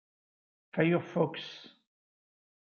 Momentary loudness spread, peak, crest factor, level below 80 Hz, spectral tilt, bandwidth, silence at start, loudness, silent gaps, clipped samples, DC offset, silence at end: 16 LU; -12 dBFS; 22 dB; -78 dBFS; -8 dB/octave; 6.8 kHz; 0.75 s; -31 LUFS; none; under 0.1%; under 0.1%; 0.95 s